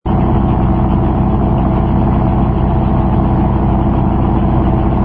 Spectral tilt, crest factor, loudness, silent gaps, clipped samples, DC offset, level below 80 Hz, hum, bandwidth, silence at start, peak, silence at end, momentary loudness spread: -12.5 dB/octave; 12 dB; -13 LUFS; none; under 0.1%; under 0.1%; -18 dBFS; none; 3.7 kHz; 0.05 s; 0 dBFS; 0 s; 1 LU